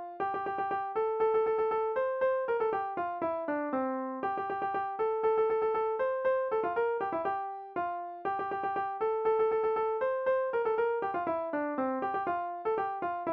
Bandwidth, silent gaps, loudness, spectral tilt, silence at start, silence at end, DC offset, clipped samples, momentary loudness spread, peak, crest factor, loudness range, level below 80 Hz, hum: 4.6 kHz; none; -32 LUFS; -4 dB/octave; 0 s; 0 s; under 0.1%; under 0.1%; 6 LU; -20 dBFS; 12 dB; 2 LU; -70 dBFS; none